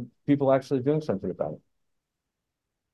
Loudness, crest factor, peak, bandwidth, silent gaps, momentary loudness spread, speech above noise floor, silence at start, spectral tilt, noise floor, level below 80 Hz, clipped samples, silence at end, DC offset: -27 LUFS; 18 dB; -10 dBFS; 9.8 kHz; none; 11 LU; 59 dB; 0 s; -8.5 dB/octave; -84 dBFS; -62 dBFS; under 0.1%; 1.35 s; under 0.1%